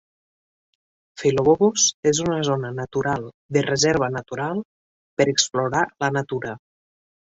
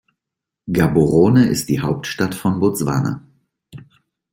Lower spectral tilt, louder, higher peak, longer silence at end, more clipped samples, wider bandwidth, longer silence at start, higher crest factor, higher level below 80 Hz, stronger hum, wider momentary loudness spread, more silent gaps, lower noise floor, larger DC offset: second, -3.5 dB/octave vs -6.5 dB/octave; second, -21 LUFS vs -17 LUFS; about the same, -4 dBFS vs -2 dBFS; first, 0.8 s vs 0.55 s; neither; second, 8 kHz vs 16.5 kHz; first, 1.15 s vs 0.65 s; about the same, 20 dB vs 16 dB; second, -56 dBFS vs -46 dBFS; neither; about the same, 11 LU vs 10 LU; first, 1.94-2.03 s, 3.34-3.49 s, 4.65-5.17 s vs none; first, under -90 dBFS vs -84 dBFS; neither